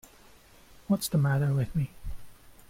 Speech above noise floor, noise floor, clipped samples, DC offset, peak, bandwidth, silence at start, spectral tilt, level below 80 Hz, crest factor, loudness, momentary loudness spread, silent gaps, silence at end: 29 dB; -55 dBFS; under 0.1%; under 0.1%; -16 dBFS; 16.5 kHz; 0.9 s; -6.5 dB/octave; -48 dBFS; 16 dB; -28 LUFS; 20 LU; none; 0.2 s